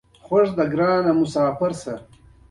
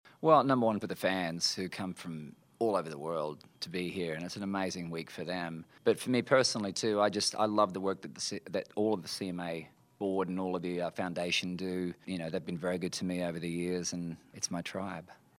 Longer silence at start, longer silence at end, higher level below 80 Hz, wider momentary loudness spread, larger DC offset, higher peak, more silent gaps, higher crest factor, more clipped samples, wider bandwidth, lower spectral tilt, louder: first, 0.3 s vs 0.05 s; first, 0.5 s vs 0.25 s; first, -54 dBFS vs -76 dBFS; about the same, 13 LU vs 12 LU; neither; first, -6 dBFS vs -10 dBFS; neither; second, 14 dB vs 24 dB; neither; second, 11.5 kHz vs 16 kHz; first, -7 dB/octave vs -4.5 dB/octave; first, -20 LUFS vs -33 LUFS